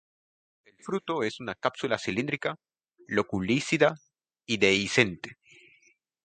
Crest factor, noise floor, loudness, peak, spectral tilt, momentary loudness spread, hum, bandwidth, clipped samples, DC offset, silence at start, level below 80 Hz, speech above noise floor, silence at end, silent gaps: 24 dB; -65 dBFS; -27 LUFS; -6 dBFS; -4.5 dB/octave; 20 LU; none; 9.4 kHz; under 0.1%; under 0.1%; 0.85 s; -62 dBFS; 38 dB; 0.9 s; none